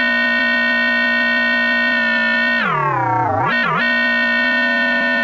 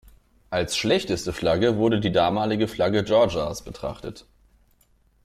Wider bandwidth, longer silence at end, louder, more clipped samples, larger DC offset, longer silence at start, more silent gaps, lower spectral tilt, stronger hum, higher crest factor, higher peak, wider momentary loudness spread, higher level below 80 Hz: about the same, 14.5 kHz vs 15 kHz; second, 0 s vs 1.05 s; first, -15 LUFS vs -23 LUFS; neither; neither; second, 0 s vs 0.5 s; neither; about the same, -5.5 dB/octave vs -5 dB/octave; neither; about the same, 12 dB vs 16 dB; about the same, -6 dBFS vs -8 dBFS; second, 3 LU vs 13 LU; about the same, -50 dBFS vs -48 dBFS